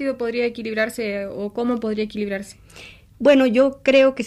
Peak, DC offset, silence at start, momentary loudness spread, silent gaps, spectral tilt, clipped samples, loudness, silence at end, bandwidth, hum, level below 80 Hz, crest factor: -4 dBFS; under 0.1%; 0 s; 12 LU; none; -5 dB/octave; under 0.1%; -20 LUFS; 0 s; 14 kHz; none; -54 dBFS; 16 dB